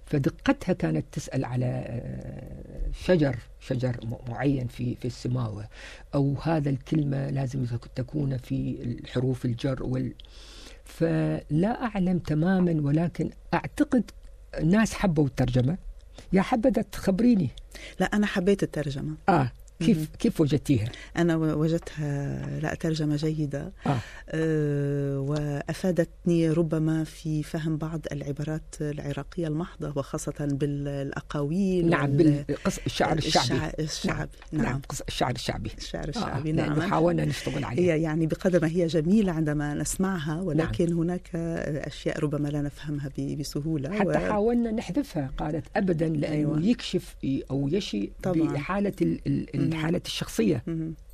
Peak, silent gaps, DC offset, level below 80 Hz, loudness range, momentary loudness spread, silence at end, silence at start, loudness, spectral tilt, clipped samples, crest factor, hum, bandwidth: -8 dBFS; none; under 0.1%; -44 dBFS; 4 LU; 9 LU; 0 s; 0 s; -27 LUFS; -6.5 dB/octave; under 0.1%; 18 dB; none; 13.5 kHz